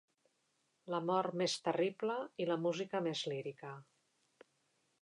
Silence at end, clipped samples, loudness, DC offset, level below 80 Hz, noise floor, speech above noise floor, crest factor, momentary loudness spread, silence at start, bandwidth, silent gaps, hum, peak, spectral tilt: 1.2 s; under 0.1%; -38 LUFS; under 0.1%; under -90 dBFS; -80 dBFS; 43 dB; 18 dB; 11 LU; 0.85 s; 11 kHz; none; none; -22 dBFS; -5 dB/octave